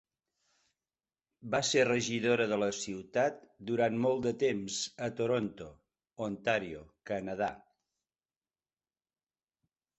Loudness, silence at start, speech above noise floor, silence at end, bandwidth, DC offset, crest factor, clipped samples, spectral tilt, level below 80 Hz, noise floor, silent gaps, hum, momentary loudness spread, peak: -32 LUFS; 1.45 s; over 58 dB; 2.4 s; 8.4 kHz; under 0.1%; 20 dB; under 0.1%; -4 dB/octave; -68 dBFS; under -90 dBFS; none; none; 11 LU; -14 dBFS